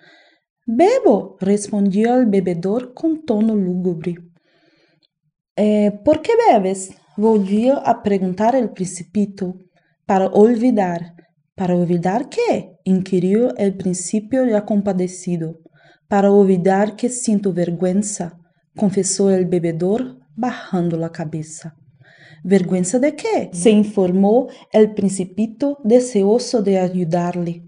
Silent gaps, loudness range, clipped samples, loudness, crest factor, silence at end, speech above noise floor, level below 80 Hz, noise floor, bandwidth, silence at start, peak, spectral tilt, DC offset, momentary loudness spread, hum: 5.51-5.55 s; 4 LU; under 0.1%; -18 LUFS; 18 dB; 0 s; 46 dB; -60 dBFS; -63 dBFS; 10 kHz; 0.65 s; 0 dBFS; -6.5 dB/octave; under 0.1%; 11 LU; none